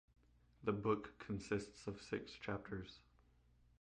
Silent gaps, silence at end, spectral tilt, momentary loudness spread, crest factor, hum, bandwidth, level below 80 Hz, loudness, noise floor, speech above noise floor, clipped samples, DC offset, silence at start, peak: none; 0.8 s; -6.5 dB/octave; 10 LU; 22 dB; none; 9.6 kHz; -66 dBFS; -45 LUFS; -72 dBFS; 28 dB; under 0.1%; under 0.1%; 0.6 s; -24 dBFS